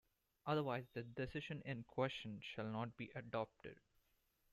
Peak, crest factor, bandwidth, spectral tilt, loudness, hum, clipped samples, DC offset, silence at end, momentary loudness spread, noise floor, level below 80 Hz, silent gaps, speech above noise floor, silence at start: -26 dBFS; 20 dB; 13.5 kHz; -7 dB/octave; -46 LUFS; none; under 0.1%; under 0.1%; 0.75 s; 9 LU; -81 dBFS; -72 dBFS; none; 35 dB; 0.45 s